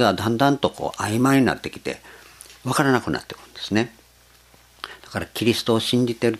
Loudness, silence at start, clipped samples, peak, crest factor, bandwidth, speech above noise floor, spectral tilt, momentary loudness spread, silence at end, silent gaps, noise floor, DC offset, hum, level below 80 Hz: -22 LUFS; 0 s; under 0.1%; -2 dBFS; 22 dB; 15 kHz; 32 dB; -5 dB/octave; 18 LU; 0 s; none; -53 dBFS; under 0.1%; 60 Hz at -55 dBFS; -54 dBFS